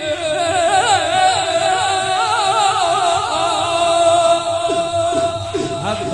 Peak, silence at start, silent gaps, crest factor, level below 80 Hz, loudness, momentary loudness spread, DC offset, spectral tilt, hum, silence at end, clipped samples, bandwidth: -4 dBFS; 0 s; none; 12 dB; -50 dBFS; -16 LUFS; 6 LU; under 0.1%; -2.5 dB/octave; none; 0 s; under 0.1%; 11.5 kHz